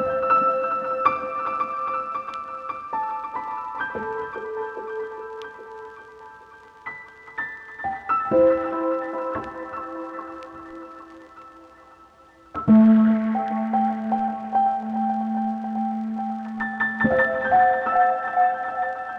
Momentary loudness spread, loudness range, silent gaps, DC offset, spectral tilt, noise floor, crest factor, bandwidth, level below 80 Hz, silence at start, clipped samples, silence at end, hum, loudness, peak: 20 LU; 14 LU; none; under 0.1%; -8.5 dB/octave; -51 dBFS; 18 dB; 5.4 kHz; -58 dBFS; 0 s; under 0.1%; 0 s; none; -23 LUFS; -6 dBFS